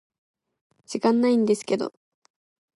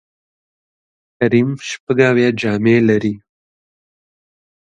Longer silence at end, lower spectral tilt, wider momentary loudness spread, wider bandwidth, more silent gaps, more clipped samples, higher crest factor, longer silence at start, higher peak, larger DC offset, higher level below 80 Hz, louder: second, 0.9 s vs 1.6 s; about the same, -5.5 dB/octave vs -6.5 dB/octave; first, 13 LU vs 10 LU; first, 11.5 kHz vs 9 kHz; second, none vs 1.80-1.87 s; neither; about the same, 18 dB vs 18 dB; second, 0.9 s vs 1.2 s; second, -8 dBFS vs 0 dBFS; neither; second, -76 dBFS vs -58 dBFS; second, -23 LUFS vs -15 LUFS